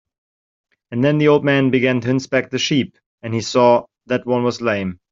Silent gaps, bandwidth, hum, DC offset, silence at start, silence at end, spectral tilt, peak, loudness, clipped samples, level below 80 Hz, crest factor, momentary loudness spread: 3.06-3.18 s; 7.6 kHz; none; under 0.1%; 0.9 s; 0.15 s; -5.5 dB/octave; -2 dBFS; -17 LUFS; under 0.1%; -58 dBFS; 16 dB; 10 LU